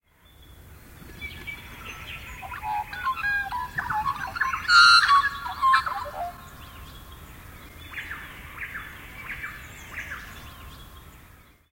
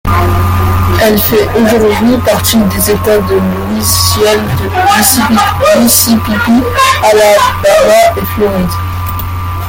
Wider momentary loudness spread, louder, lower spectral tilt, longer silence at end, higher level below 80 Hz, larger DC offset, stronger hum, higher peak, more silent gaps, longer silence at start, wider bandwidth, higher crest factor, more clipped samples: first, 26 LU vs 7 LU; second, -22 LUFS vs -8 LUFS; second, -1 dB/octave vs -4.5 dB/octave; first, 0.55 s vs 0 s; second, -50 dBFS vs -26 dBFS; neither; neither; second, -4 dBFS vs 0 dBFS; neither; first, 0.5 s vs 0.05 s; second, 16.5 kHz vs over 20 kHz; first, 24 dB vs 8 dB; second, under 0.1% vs 0.2%